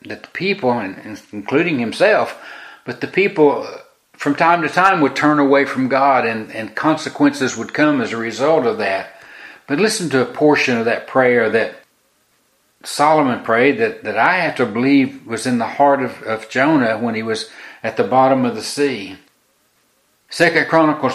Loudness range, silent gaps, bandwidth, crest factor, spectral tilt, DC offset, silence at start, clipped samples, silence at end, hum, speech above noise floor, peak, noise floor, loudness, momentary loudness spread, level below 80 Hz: 3 LU; none; 14 kHz; 18 dB; -5 dB/octave; under 0.1%; 0.05 s; under 0.1%; 0 s; none; 44 dB; 0 dBFS; -60 dBFS; -16 LUFS; 14 LU; -64 dBFS